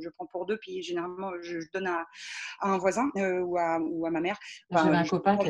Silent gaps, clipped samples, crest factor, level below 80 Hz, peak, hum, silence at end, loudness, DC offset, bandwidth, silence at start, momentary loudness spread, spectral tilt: none; under 0.1%; 20 dB; -68 dBFS; -10 dBFS; none; 0 s; -30 LUFS; under 0.1%; 11 kHz; 0 s; 12 LU; -5.5 dB/octave